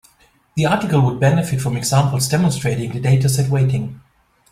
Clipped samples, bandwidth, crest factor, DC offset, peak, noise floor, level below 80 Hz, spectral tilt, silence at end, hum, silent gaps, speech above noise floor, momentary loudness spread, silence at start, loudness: under 0.1%; 15.5 kHz; 16 dB; under 0.1%; -2 dBFS; -55 dBFS; -46 dBFS; -6 dB/octave; 0.55 s; none; none; 39 dB; 6 LU; 0.55 s; -17 LUFS